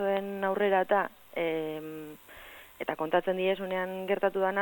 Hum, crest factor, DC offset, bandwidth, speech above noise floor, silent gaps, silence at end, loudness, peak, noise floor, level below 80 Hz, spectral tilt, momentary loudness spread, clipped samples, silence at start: none; 18 dB; under 0.1%; 17.5 kHz; 21 dB; none; 0 s; -30 LUFS; -12 dBFS; -50 dBFS; -68 dBFS; -6 dB/octave; 19 LU; under 0.1%; 0 s